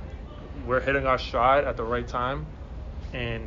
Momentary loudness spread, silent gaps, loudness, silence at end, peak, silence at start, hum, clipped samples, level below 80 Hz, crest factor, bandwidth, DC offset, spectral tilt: 19 LU; none; -26 LUFS; 0 s; -10 dBFS; 0 s; none; under 0.1%; -38 dBFS; 18 dB; 7.4 kHz; under 0.1%; -4 dB/octave